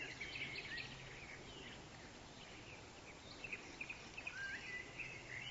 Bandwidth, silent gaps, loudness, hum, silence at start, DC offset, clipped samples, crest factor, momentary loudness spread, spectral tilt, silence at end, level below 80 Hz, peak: 7.6 kHz; none; -49 LUFS; none; 0 s; under 0.1%; under 0.1%; 18 dB; 10 LU; -1.5 dB/octave; 0 s; -68 dBFS; -34 dBFS